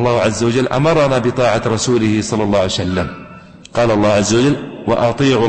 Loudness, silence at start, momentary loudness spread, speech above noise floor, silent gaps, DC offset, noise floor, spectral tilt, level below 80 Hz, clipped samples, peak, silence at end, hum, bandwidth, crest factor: -15 LUFS; 0 s; 7 LU; 23 dB; none; under 0.1%; -37 dBFS; -5.5 dB/octave; -40 dBFS; under 0.1%; -4 dBFS; 0 s; none; 8.8 kHz; 10 dB